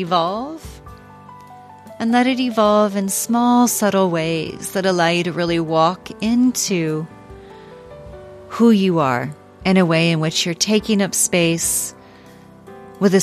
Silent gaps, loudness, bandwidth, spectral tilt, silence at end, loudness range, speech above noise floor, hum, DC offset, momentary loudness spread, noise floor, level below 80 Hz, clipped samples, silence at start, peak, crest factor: none; -17 LUFS; 15 kHz; -4.5 dB/octave; 0 s; 3 LU; 26 dB; none; under 0.1%; 14 LU; -43 dBFS; -50 dBFS; under 0.1%; 0 s; -2 dBFS; 16 dB